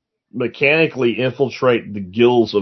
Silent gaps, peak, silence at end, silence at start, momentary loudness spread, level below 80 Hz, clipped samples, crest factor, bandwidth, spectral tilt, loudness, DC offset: none; -2 dBFS; 0 s; 0.35 s; 11 LU; -64 dBFS; under 0.1%; 16 dB; 6.2 kHz; -7 dB/octave; -17 LUFS; under 0.1%